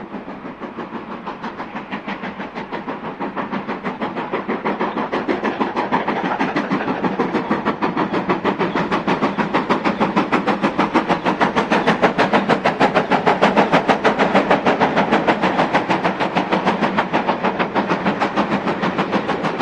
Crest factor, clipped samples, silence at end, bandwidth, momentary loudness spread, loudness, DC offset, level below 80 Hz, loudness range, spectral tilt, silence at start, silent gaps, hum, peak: 18 dB; under 0.1%; 0 s; 10.5 kHz; 13 LU; -19 LUFS; under 0.1%; -52 dBFS; 10 LU; -6 dB/octave; 0 s; none; none; 0 dBFS